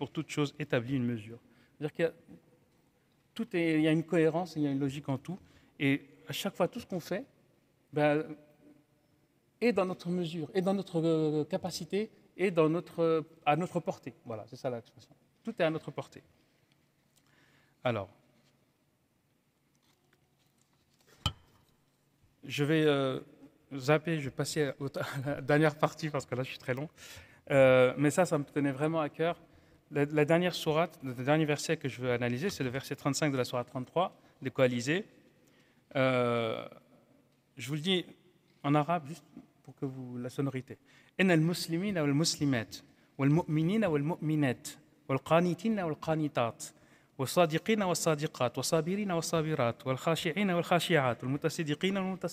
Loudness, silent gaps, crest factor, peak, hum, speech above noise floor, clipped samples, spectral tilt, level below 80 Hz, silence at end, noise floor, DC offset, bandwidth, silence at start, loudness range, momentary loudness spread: -32 LUFS; none; 20 dB; -12 dBFS; none; 42 dB; under 0.1%; -5.5 dB/octave; -66 dBFS; 0 s; -74 dBFS; under 0.1%; 16 kHz; 0 s; 10 LU; 14 LU